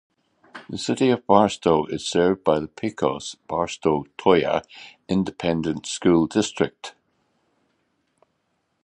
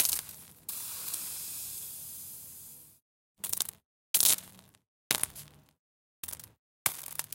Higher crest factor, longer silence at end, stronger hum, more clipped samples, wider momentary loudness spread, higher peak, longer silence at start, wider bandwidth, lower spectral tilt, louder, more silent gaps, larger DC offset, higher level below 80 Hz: second, 22 dB vs 34 dB; first, 1.95 s vs 0.05 s; neither; neither; second, 13 LU vs 21 LU; about the same, -2 dBFS vs -2 dBFS; first, 0.55 s vs 0 s; second, 11 kHz vs 17 kHz; first, -5.5 dB/octave vs 1 dB/octave; first, -22 LUFS vs -32 LUFS; second, none vs 3.02-3.35 s, 3.85-4.14 s, 4.88-5.10 s, 5.79-6.23 s, 6.59-6.85 s; neither; first, -54 dBFS vs -70 dBFS